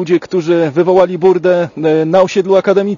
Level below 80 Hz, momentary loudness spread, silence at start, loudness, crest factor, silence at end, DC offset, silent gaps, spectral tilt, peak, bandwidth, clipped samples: -56 dBFS; 4 LU; 0 s; -12 LUFS; 12 dB; 0 s; under 0.1%; none; -7 dB/octave; 0 dBFS; 7.4 kHz; 0.2%